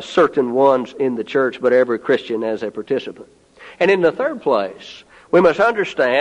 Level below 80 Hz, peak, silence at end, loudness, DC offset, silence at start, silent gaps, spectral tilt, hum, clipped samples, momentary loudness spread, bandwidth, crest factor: -60 dBFS; -2 dBFS; 0 s; -17 LUFS; under 0.1%; 0 s; none; -6 dB/octave; none; under 0.1%; 9 LU; 10 kHz; 16 dB